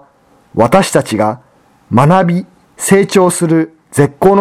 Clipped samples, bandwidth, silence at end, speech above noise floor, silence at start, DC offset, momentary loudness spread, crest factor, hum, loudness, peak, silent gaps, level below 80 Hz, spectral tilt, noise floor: 0.4%; 16 kHz; 0 s; 39 dB; 0.55 s; under 0.1%; 9 LU; 12 dB; none; -12 LUFS; 0 dBFS; none; -44 dBFS; -6 dB/octave; -49 dBFS